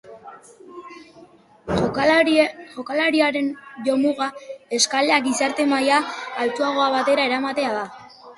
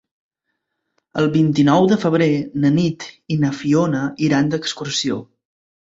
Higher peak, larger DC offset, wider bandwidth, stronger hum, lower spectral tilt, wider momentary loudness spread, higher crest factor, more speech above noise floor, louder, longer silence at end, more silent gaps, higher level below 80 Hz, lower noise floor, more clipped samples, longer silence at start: about the same, -4 dBFS vs -2 dBFS; neither; first, 11.5 kHz vs 8 kHz; neither; second, -3 dB/octave vs -6 dB/octave; first, 13 LU vs 9 LU; about the same, 18 dB vs 16 dB; second, 29 dB vs 59 dB; about the same, -20 LUFS vs -18 LUFS; second, 0.05 s vs 0.7 s; neither; about the same, -54 dBFS vs -56 dBFS; second, -49 dBFS vs -76 dBFS; neither; second, 0.05 s vs 1.15 s